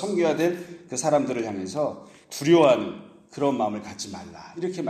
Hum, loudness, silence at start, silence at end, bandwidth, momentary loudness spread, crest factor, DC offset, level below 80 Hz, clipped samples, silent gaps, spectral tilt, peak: none; -24 LUFS; 0 s; 0 s; 15 kHz; 20 LU; 20 dB; under 0.1%; -68 dBFS; under 0.1%; none; -5 dB/octave; -6 dBFS